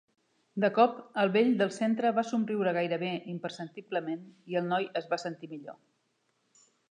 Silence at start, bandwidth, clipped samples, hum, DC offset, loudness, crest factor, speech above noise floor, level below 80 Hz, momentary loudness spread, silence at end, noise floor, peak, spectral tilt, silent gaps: 0.55 s; 10 kHz; under 0.1%; none; under 0.1%; -30 LUFS; 20 dB; 46 dB; -86 dBFS; 16 LU; 1.2 s; -76 dBFS; -10 dBFS; -6 dB/octave; none